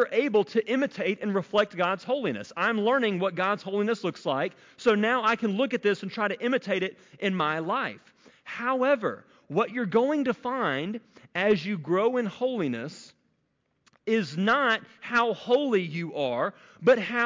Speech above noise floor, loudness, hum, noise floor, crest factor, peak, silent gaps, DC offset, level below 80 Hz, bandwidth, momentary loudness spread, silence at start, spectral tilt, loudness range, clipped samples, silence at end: 48 dB; -27 LUFS; none; -74 dBFS; 14 dB; -12 dBFS; none; under 0.1%; -74 dBFS; 7.6 kHz; 8 LU; 0 s; -6 dB/octave; 3 LU; under 0.1%; 0 s